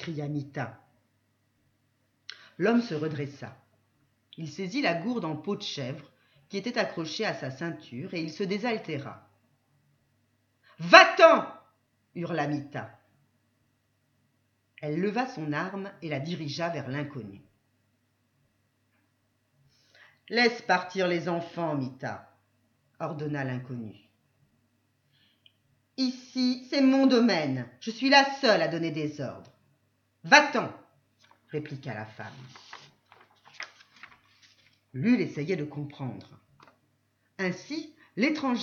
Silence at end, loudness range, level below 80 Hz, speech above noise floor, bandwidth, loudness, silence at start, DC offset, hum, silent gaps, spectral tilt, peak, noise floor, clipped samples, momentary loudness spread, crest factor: 0 s; 16 LU; -78 dBFS; 45 dB; 7.2 kHz; -27 LUFS; 0 s; under 0.1%; none; none; -5 dB/octave; 0 dBFS; -73 dBFS; under 0.1%; 22 LU; 30 dB